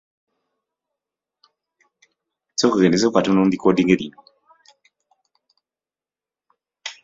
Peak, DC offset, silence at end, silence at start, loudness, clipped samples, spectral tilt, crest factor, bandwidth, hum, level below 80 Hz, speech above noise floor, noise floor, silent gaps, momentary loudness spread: -2 dBFS; under 0.1%; 0.1 s; 2.6 s; -18 LUFS; under 0.1%; -5.5 dB/octave; 20 dB; 7.8 kHz; none; -60 dBFS; over 73 dB; under -90 dBFS; none; 18 LU